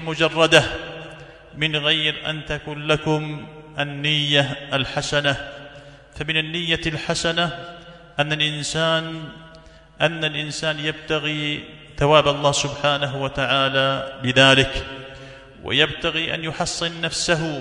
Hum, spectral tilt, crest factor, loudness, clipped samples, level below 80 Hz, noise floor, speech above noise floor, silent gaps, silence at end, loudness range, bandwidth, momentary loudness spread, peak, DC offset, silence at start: none; -3.5 dB/octave; 22 dB; -20 LUFS; under 0.1%; -46 dBFS; -46 dBFS; 25 dB; none; 0 s; 5 LU; 12 kHz; 19 LU; 0 dBFS; under 0.1%; 0 s